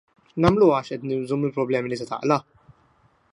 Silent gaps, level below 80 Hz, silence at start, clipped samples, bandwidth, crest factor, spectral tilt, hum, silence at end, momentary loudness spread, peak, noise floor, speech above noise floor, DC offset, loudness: none; -50 dBFS; 0.35 s; under 0.1%; 11 kHz; 20 dB; -7.5 dB/octave; none; 0.9 s; 11 LU; -4 dBFS; -61 dBFS; 39 dB; under 0.1%; -23 LUFS